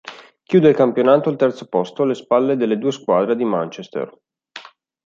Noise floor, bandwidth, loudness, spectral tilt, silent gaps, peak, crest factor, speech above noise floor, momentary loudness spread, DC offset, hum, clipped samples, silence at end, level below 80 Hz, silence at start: -41 dBFS; 7.6 kHz; -18 LUFS; -7.5 dB/octave; none; -2 dBFS; 16 dB; 24 dB; 17 LU; under 0.1%; none; under 0.1%; 0.45 s; -66 dBFS; 0.05 s